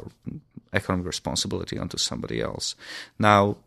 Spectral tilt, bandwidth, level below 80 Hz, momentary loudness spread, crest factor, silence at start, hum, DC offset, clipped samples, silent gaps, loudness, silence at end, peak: -4 dB/octave; 14 kHz; -50 dBFS; 20 LU; 24 dB; 0 s; none; under 0.1%; under 0.1%; none; -25 LUFS; 0.1 s; -2 dBFS